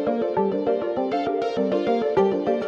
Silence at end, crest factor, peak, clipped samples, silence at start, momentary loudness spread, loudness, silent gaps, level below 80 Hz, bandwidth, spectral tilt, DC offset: 0 s; 14 dB; -8 dBFS; under 0.1%; 0 s; 3 LU; -23 LUFS; none; -58 dBFS; 7.4 kHz; -7.5 dB/octave; under 0.1%